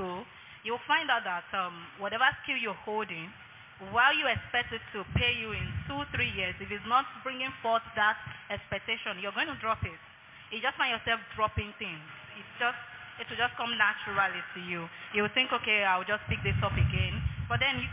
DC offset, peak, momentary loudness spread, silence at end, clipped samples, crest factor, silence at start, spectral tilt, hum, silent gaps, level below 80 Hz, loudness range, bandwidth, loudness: under 0.1%; -12 dBFS; 13 LU; 0 s; under 0.1%; 20 dB; 0 s; -2 dB/octave; none; none; -48 dBFS; 4 LU; 3.9 kHz; -30 LUFS